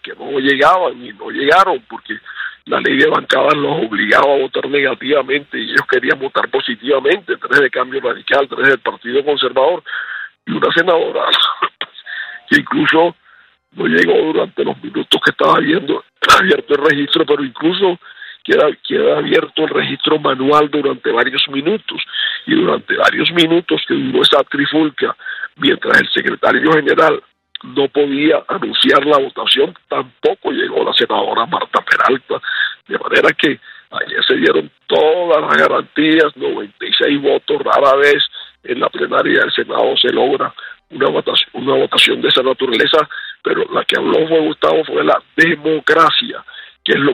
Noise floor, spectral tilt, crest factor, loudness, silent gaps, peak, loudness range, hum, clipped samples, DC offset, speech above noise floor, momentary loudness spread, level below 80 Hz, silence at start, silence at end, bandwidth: -49 dBFS; -4.5 dB/octave; 14 dB; -14 LUFS; none; 0 dBFS; 2 LU; none; under 0.1%; under 0.1%; 35 dB; 11 LU; -56 dBFS; 0.05 s; 0 s; 16 kHz